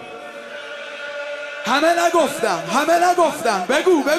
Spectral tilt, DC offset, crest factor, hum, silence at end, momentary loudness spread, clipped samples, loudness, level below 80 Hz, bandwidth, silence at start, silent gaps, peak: -3 dB/octave; under 0.1%; 16 dB; none; 0 s; 16 LU; under 0.1%; -18 LUFS; -66 dBFS; 14.5 kHz; 0 s; none; -4 dBFS